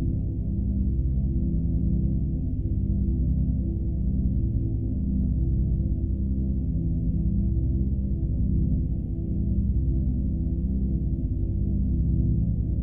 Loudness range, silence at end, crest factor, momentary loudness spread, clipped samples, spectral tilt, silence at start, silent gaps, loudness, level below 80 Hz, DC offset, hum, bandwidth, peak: 0 LU; 0 s; 12 dB; 3 LU; under 0.1%; -14.5 dB/octave; 0 s; none; -27 LUFS; -26 dBFS; 0.9%; none; 0.8 kHz; -12 dBFS